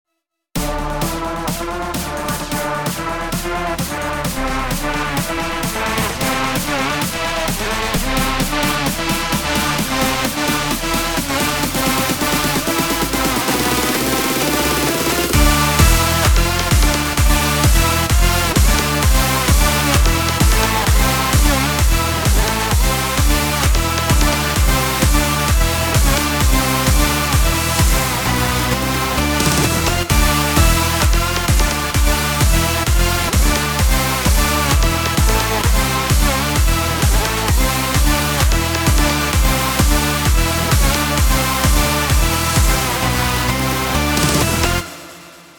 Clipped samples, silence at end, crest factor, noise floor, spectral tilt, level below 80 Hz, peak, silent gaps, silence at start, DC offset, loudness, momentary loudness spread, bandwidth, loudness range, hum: under 0.1%; 0.2 s; 16 dB; -76 dBFS; -3.5 dB/octave; -20 dBFS; 0 dBFS; none; 0.55 s; 0.2%; -16 LUFS; 6 LU; 19.5 kHz; 5 LU; none